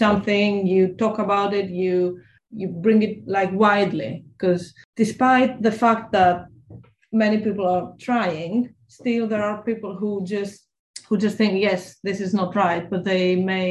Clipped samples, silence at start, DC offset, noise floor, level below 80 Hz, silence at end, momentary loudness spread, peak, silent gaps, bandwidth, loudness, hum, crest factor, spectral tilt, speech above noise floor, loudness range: under 0.1%; 0 s; under 0.1%; -46 dBFS; -58 dBFS; 0 s; 11 LU; -4 dBFS; 4.85-4.93 s, 10.79-10.94 s; 11.5 kHz; -21 LUFS; none; 18 dB; -6.5 dB/octave; 25 dB; 4 LU